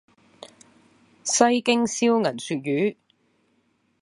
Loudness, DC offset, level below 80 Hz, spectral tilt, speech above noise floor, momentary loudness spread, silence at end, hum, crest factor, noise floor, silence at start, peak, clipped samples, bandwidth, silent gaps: -22 LUFS; under 0.1%; -72 dBFS; -3.5 dB/octave; 46 dB; 9 LU; 1.1 s; none; 24 dB; -67 dBFS; 1.25 s; -2 dBFS; under 0.1%; 11.5 kHz; none